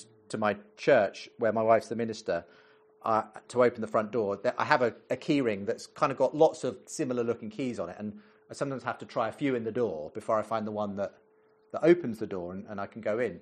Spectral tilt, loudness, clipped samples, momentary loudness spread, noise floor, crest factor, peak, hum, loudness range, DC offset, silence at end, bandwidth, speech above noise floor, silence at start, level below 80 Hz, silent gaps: -6 dB/octave; -30 LUFS; under 0.1%; 12 LU; -56 dBFS; 24 dB; -6 dBFS; none; 5 LU; under 0.1%; 0 s; 11 kHz; 26 dB; 0 s; -72 dBFS; none